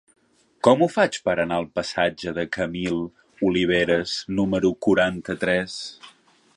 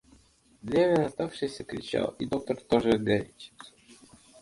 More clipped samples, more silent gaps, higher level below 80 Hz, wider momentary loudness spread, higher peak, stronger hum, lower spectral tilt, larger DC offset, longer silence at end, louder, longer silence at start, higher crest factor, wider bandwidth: neither; neither; first, -52 dBFS vs -58 dBFS; second, 9 LU vs 20 LU; first, -2 dBFS vs -8 dBFS; neither; about the same, -5 dB/octave vs -6 dB/octave; neither; about the same, 0.45 s vs 0.5 s; first, -23 LUFS vs -28 LUFS; about the same, 0.65 s vs 0.65 s; about the same, 20 dB vs 22 dB; about the same, 11 kHz vs 11.5 kHz